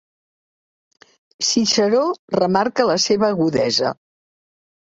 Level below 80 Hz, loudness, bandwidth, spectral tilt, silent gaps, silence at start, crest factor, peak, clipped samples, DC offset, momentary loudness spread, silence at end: -60 dBFS; -18 LUFS; 8 kHz; -3.5 dB/octave; 2.19-2.28 s; 1.4 s; 18 dB; -2 dBFS; under 0.1%; under 0.1%; 5 LU; 0.9 s